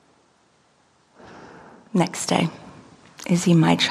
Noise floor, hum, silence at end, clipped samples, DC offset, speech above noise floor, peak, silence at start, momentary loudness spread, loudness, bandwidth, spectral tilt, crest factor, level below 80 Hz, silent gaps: -61 dBFS; none; 0 s; under 0.1%; under 0.1%; 41 dB; -2 dBFS; 1.35 s; 26 LU; -21 LUFS; 13.5 kHz; -5 dB/octave; 22 dB; -60 dBFS; none